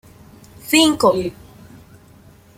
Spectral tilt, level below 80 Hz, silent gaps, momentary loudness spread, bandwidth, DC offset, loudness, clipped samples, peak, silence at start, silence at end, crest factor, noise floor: -3 dB/octave; -52 dBFS; none; 17 LU; 16.5 kHz; under 0.1%; -16 LUFS; under 0.1%; 0 dBFS; 0.65 s; 1.25 s; 20 dB; -47 dBFS